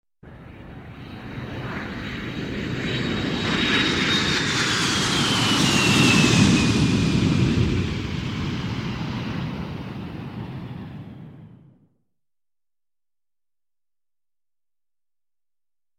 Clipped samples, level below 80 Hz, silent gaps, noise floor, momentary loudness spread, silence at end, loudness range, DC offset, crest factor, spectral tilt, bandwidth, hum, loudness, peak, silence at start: under 0.1%; -42 dBFS; none; under -90 dBFS; 20 LU; 4.5 s; 18 LU; under 0.1%; 20 dB; -4 dB/octave; 16 kHz; none; -21 LUFS; -4 dBFS; 0.25 s